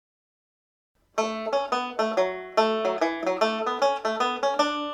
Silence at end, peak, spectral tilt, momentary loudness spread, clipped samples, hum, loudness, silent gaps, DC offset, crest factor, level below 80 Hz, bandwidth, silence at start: 0 s; -8 dBFS; -3 dB/octave; 4 LU; under 0.1%; none; -26 LUFS; none; under 0.1%; 18 dB; -70 dBFS; 13 kHz; 1.15 s